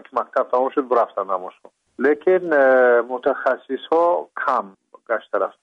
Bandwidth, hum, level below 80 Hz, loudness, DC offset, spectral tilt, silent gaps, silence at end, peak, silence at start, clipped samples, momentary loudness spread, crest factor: 6 kHz; none; -72 dBFS; -20 LUFS; under 0.1%; -6.5 dB/octave; none; 0.15 s; -6 dBFS; 0.15 s; under 0.1%; 11 LU; 14 dB